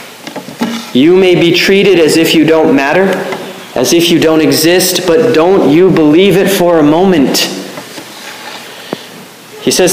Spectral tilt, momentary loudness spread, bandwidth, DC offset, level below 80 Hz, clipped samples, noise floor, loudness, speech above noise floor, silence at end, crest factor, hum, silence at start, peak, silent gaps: -4.5 dB/octave; 18 LU; 16 kHz; under 0.1%; -46 dBFS; under 0.1%; -31 dBFS; -8 LUFS; 24 dB; 0 s; 8 dB; none; 0 s; 0 dBFS; none